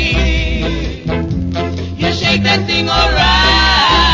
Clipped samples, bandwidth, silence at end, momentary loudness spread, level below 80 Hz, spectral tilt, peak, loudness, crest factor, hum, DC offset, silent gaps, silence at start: under 0.1%; 7.6 kHz; 0 s; 10 LU; -20 dBFS; -4.5 dB/octave; 0 dBFS; -13 LUFS; 12 dB; none; under 0.1%; none; 0 s